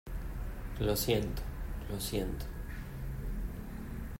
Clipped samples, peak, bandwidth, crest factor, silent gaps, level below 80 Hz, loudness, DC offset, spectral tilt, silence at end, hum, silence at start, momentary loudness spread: under 0.1%; -18 dBFS; 16 kHz; 18 dB; none; -40 dBFS; -38 LUFS; under 0.1%; -5 dB/octave; 0 s; none; 0.05 s; 12 LU